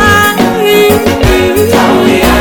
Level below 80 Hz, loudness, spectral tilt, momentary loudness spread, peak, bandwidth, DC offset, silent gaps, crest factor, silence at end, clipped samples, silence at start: -20 dBFS; -7 LUFS; -4.5 dB/octave; 2 LU; 0 dBFS; over 20 kHz; under 0.1%; none; 6 dB; 0 s; 4%; 0 s